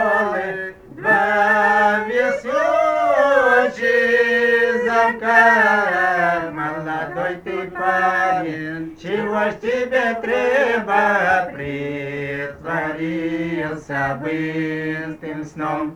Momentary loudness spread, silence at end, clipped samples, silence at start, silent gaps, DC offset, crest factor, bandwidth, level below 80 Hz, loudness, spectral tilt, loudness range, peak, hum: 12 LU; 0 s; under 0.1%; 0 s; none; under 0.1%; 18 dB; 13.5 kHz; -54 dBFS; -18 LUFS; -5.5 dB/octave; 9 LU; -2 dBFS; none